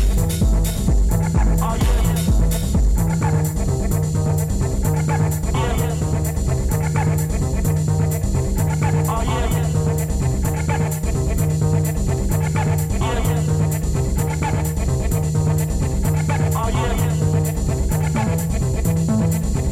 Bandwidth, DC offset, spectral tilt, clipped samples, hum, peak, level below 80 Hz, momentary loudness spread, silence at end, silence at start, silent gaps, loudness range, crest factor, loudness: 16.5 kHz; under 0.1%; -6.5 dB/octave; under 0.1%; none; -6 dBFS; -22 dBFS; 3 LU; 0 s; 0 s; none; 1 LU; 12 dB; -20 LUFS